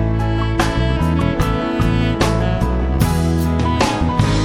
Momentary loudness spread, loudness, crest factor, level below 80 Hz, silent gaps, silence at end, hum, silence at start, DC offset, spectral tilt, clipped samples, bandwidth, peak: 2 LU; -17 LUFS; 16 dB; -22 dBFS; none; 0 s; none; 0 s; 0.4%; -6.5 dB/octave; under 0.1%; 17 kHz; 0 dBFS